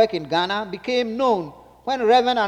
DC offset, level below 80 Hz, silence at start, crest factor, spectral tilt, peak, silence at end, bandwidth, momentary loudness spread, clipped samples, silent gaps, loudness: under 0.1%; -58 dBFS; 0 s; 16 dB; -4.5 dB/octave; -6 dBFS; 0 s; 9.4 kHz; 10 LU; under 0.1%; none; -21 LUFS